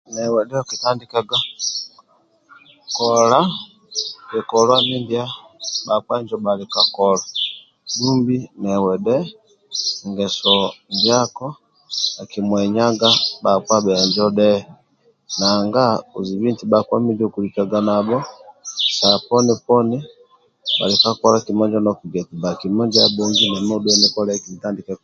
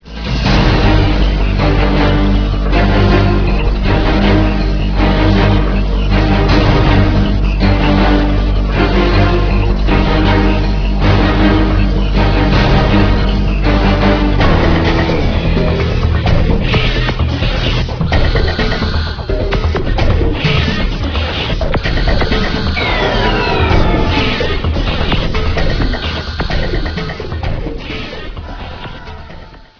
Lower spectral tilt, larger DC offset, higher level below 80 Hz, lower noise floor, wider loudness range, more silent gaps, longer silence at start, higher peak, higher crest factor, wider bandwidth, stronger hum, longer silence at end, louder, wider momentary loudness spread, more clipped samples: second, -4 dB/octave vs -7 dB/octave; neither; second, -58 dBFS vs -16 dBFS; first, -58 dBFS vs -33 dBFS; about the same, 3 LU vs 4 LU; neither; about the same, 0.1 s vs 0.05 s; about the same, 0 dBFS vs 0 dBFS; first, 18 dB vs 12 dB; first, 7.6 kHz vs 5.4 kHz; neither; about the same, 0.1 s vs 0.15 s; second, -18 LUFS vs -13 LUFS; first, 12 LU vs 8 LU; neither